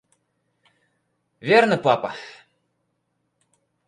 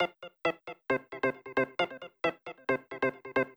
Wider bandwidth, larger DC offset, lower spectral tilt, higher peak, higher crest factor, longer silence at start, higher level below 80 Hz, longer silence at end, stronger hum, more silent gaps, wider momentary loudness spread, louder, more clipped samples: second, 11 kHz vs over 20 kHz; neither; about the same, -5.5 dB/octave vs -6 dB/octave; first, -4 dBFS vs -16 dBFS; about the same, 22 dB vs 18 dB; first, 1.45 s vs 0 s; about the same, -72 dBFS vs -70 dBFS; first, 1.55 s vs 0.05 s; neither; neither; first, 21 LU vs 3 LU; first, -20 LUFS vs -33 LUFS; neither